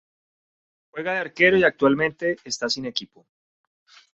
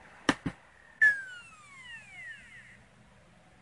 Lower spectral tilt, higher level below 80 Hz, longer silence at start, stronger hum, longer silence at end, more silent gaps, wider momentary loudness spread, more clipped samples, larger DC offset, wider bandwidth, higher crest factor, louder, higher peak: about the same, -4 dB/octave vs -3.5 dB/octave; about the same, -62 dBFS vs -64 dBFS; first, 0.95 s vs 0.3 s; neither; about the same, 1.1 s vs 1 s; neither; second, 14 LU vs 25 LU; neither; neither; second, 8.2 kHz vs 11.5 kHz; second, 20 dB vs 26 dB; first, -22 LUFS vs -28 LUFS; first, -4 dBFS vs -10 dBFS